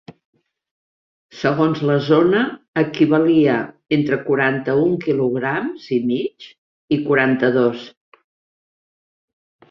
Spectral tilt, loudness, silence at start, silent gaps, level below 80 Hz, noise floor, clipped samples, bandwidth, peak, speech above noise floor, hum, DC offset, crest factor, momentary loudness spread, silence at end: -8 dB/octave; -18 LUFS; 1.35 s; 2.68-2.73 s, 6.58-6.88 s; -60 dBFS; under -90 dBFS; under 0.1%; 6.4 kHz; -2 dBFS; over 73 dB; none; under 0.1%; 18 dB; 8 LU; 1.8 s